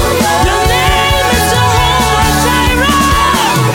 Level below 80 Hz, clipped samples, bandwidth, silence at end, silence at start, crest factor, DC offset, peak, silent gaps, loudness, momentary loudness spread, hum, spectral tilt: -20 dBFS; under 0.1%; 17.5 kHz; 0 s; 0 s; 10 dB; under 0.1%; 0 dBFS; none; -9 LUFS; 1 LU; none; -3.5 dB/octave